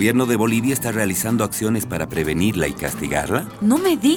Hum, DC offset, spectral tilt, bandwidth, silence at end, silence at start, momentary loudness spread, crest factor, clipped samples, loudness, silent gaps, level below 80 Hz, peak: none; under 0.1%; -5 dB/octave; 19 kHz; 0 s; 0 s; 6 LU; 16 dB; under 0.1%; -20 LUFS; none; -42 dBFS; -4 dBFS